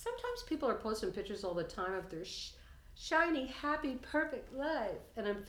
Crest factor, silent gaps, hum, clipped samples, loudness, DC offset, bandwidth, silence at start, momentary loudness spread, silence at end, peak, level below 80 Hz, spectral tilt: 20 dB; none; none; under 0.1%; -38 LUFS; under 0.1%; over 20 kHz; 0 s; 10 LU; 0 s; -18 dBFS; -58 dBFS; -4 dB/octave